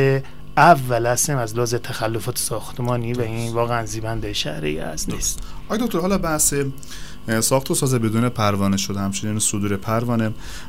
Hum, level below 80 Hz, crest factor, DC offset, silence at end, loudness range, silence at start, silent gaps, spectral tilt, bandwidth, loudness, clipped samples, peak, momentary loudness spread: none; -38 dBFS; 20 dB; 3%; 0 s; 4 LU; 0 s; none; -4.5 dB/octave; 16 kHz; -21 LUFS; under 0.1%; 0 dBFS; 9 LU